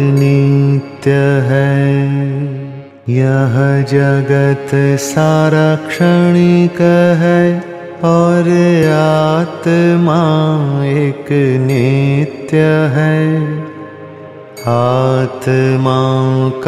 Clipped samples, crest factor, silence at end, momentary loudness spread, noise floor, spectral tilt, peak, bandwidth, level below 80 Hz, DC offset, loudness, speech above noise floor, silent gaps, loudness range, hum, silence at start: under 0.1%; 10 dB; 0 s; 9 LU; -31 dBFS; -7.5 dB/octave; 0 dBFS; 13 kHz; -52 dBFS; under 0.1%; -12 LUFS; 21 dB; none; 4 LU; none; 0 s